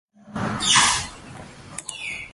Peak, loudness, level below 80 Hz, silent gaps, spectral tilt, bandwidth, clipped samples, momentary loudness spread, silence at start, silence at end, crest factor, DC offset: -2 dBFS; -20 LUFS; -50 dBFS; none; -1 dB/octave; 12 kHz; under 0.1%; 24 LU; 0.25 s; 0 s; 22 dB; under 0.1%